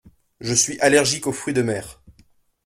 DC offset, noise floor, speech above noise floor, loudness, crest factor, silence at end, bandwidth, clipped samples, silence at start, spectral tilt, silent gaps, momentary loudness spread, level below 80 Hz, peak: under 0.1%; -57 dBFS; 37 dB; -19 LUFS; 22 dB; 0.75 s; 16 kHz; under 0.1%; 0.4 s; -3 dB/octave; none; 14 LU; -54 dBFS; -2 dBFS